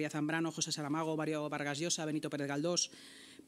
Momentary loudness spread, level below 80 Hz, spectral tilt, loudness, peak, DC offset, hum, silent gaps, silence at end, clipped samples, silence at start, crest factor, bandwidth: 4 LU; -86 dBFS; -3.5 dB/octave; -36 LUFS; -20 dBFS; under 0.1%; none; none; 0.05 s; under 0.1%; 0 s; 16 dB; 15 kHz